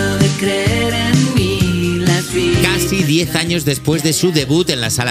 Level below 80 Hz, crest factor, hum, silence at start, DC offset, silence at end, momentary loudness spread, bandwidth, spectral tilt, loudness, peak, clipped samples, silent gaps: -34 dBFS; 14 dB; none; 0 s; under 0.1%; 0 s; 2 LU; 16 kHz; -4.5 dB/octave; -15 LUFS; 0 dBFS; under 0.1%; none